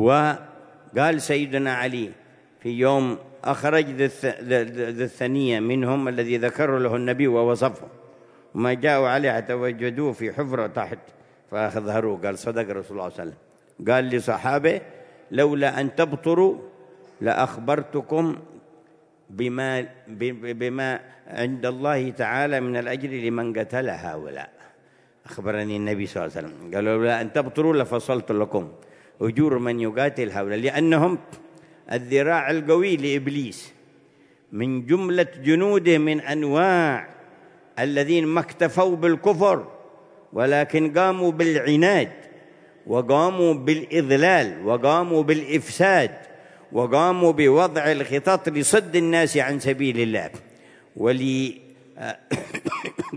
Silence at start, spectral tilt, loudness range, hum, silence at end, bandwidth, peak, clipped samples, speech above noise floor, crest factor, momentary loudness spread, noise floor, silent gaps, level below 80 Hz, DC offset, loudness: 0 s; -5.5 dB/octave; 7 LU; none; 0 s; 11 kHz; -4 dBFS; under 0.1%; 36 dB; 18 dB; 12 LU; -58 dBFS; none; -68 dBFS; under 0.1%; -22 LUFS